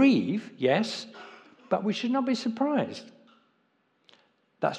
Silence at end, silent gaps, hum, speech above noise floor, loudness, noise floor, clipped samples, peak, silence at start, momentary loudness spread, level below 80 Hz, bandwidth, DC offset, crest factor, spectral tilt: 0 s; none; none; 44 dB; -28 LUFS; -71 dBFS; under 0.1%; -10 dBFS; 0 s; 18 LU; -86 dBFS; 9.4 kHz; under 0.1%; 20 dB; -6 dB/octave